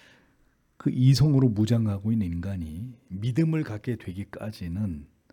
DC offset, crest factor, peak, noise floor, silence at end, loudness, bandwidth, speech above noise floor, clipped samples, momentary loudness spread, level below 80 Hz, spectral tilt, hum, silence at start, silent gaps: under 0.1%; 18 dB; -8 dBFS; -65 dBFS; 0.25 s; -26 LUFS; 14 kHz; 40 dB; under 0.1%; 16 LU; -52 dBFS; -7.5 dB/octave; none; 0.85 s; none